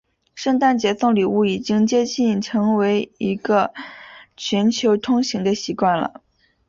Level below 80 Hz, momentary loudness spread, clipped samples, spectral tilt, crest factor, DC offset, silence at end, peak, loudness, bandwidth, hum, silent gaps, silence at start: -60 dBFS; 8 LU; under 0.1%; -5 dB/octave; 14 dB; under 0.1%; 0.6 s; -4 dBFS; -19 LUFS; 7.6 kHz; none; none; 0.35 s